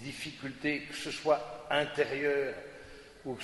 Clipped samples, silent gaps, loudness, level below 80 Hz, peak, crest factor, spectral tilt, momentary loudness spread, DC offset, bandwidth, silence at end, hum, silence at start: under 0.1%; none; -33 LUFS; -64 dBFS; -14 dBFS; 20 dB; -4 dB/octave; 15 LU; under 0.1%; 11.5 kHz; 0 s; none; 0 s